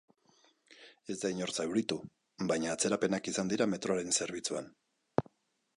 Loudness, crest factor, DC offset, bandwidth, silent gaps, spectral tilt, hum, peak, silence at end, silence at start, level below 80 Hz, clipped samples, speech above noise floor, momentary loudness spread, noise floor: -34 LUFS; 26 dB; under 0.1%; 11.5 kHz; none; -3.5 dB/octave; none; -10 dBFS; 0.55 s; 0.8 s; -70 dBFS; under 0.1%; 35 dB; 10 LU; -69 dBFS